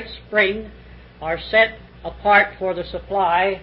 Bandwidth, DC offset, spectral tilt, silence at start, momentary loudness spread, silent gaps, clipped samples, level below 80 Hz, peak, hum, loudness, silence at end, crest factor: 5.6 kHz; under 0.1%; -9 dB/octave; 0 s; 17 LU; none; under 0.1%; -44 dBFS; -2 dBFS; none; -19 LUFS; 0 s; 18 dB